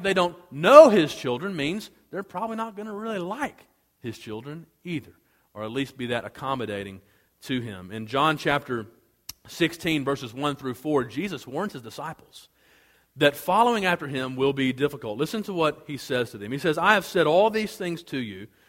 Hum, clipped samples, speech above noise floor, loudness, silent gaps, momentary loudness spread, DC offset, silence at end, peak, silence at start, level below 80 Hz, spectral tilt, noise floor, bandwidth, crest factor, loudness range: none; under 0.1%; 36 dB; -24 LUFS; none; 16 LU; under 0.1%; 0.25 s; 0 dBFS; 0 s; -62 dBFS; -5 dB/octave; -60 dBFS; 16.5 kHz; 24 dB; 10 LU